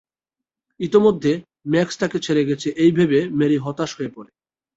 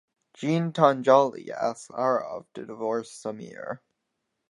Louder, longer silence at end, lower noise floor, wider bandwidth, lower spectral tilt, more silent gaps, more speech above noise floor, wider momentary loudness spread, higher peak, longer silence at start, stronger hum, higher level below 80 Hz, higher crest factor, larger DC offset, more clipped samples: first, -19 LUFS vs -25 LUFS; second, 0.5 s vs 0.75 s; first, -87 dBFS vs -80 dBFS; second, 8 kHz vs 11 kHz; about the same, -6.5 dB/octave vs -6.5 dB/octave; neither; first, 68 dB vs 54 dB; second, 10 LU vs 18 LU; about the same, -4 dBFS vs -4 dBFS; first, 0.8 s vs 0.4 s; neither; first, -58 dBFS vs -78 dBFS; about the same, 18 dB vs 22 dB; neither; neither